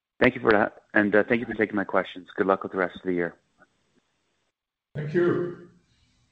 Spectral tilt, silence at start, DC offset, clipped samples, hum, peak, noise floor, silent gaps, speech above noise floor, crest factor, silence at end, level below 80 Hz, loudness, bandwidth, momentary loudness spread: -8.5 dB/octave; 0.2 s; under 0.1%; under 0.1%; none; -4 dBFS; -81 dBFS; none; 57 dB; 22 dB; 0.65 s; -58 dBFS; -25 LUFS; 6.4 kHz; 13 LU